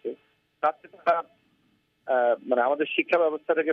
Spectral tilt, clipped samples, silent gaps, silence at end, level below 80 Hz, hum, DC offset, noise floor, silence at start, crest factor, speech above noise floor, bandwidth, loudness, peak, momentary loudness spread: -6 dB/octave; under 0.1%; none; 0 s; -86 dBFS; none; under 0.1%; -68 dBFS; 0.05 s; 18 dB; 44 dB; 6 kHz; -25 LUFS; -8 dBFS; 15 LU